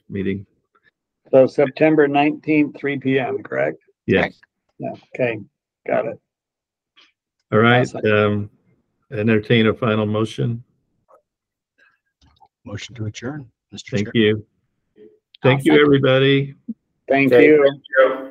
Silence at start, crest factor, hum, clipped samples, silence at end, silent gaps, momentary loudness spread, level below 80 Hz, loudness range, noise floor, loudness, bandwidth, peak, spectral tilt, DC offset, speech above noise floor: 0.1 s; 18 dB; none; under 0.1%; 0 s; none; 19 LU; -58 dBFS; 12 LU; -86 dBFS; -17 LUFS; 10.5 kHz; 0 dBFS; -7 dB/octave; under 0.1%; 69 dB